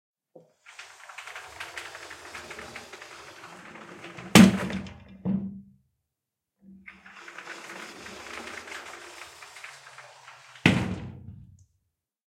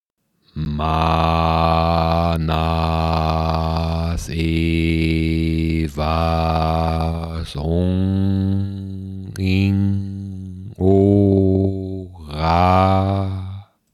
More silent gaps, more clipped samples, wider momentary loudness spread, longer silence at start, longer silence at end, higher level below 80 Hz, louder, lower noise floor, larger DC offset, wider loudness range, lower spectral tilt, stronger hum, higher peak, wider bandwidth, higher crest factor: neither; neither; first, 24 LU vs 14 LU; first, 0.8 s vs 0.55 s; first, 1 s vs 0.3 s; second, -58 dBFS vs -30 dBFS; second, -25 LUFS vs -19 LUFS; first, -86 dBFS vs -63 dBFS; neither; first, 17 LU vs 3 LU; second, -5 dB/octave vs -8 dB/octave; neither; about the same, 0 dBFS vs -2 dBFS; first, 16.5 kHz vs 13 kHz; first, 30 dB vs 16 dB